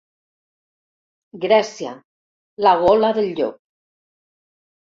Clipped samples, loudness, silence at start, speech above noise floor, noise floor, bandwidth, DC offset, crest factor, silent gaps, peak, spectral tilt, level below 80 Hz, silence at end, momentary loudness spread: under 0.1%; -18 LUFS; 1.35 s; over 73 dB; under -90 dBFS; 7.6 kHz; under 0.1%; 20 dB; 2.05-2.57 s; -2 dBFS; -5 dB/octave; -56 dBFS; 1.4 s; 14 LU